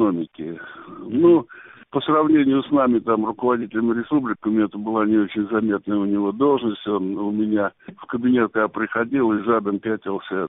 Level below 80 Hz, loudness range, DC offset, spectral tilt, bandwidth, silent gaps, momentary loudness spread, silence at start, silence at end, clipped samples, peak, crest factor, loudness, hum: -60 dBFS; 2 LU; under 0.1%; -5.5 dB/octave; 3.9 kHz; none; 10 LU; 0 s; 0 s; under 0.1%; -6 dBFS; 14 dB; -21 LUFS; none